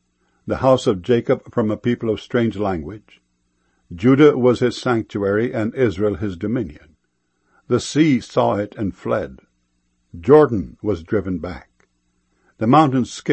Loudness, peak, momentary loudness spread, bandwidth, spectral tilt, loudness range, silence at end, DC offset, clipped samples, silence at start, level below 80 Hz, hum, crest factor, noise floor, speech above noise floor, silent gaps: -19 LUFS; 0 dBFS; 15 LU; 8.6 kHz; -7 dB/octave; 4 LU; 0 s; under 0.1%; under 0.1%; 0.45 s; -48 dBFS; 60 Hz at -50 dBFS; 18 dB; -70 dBFS; 52 dB; none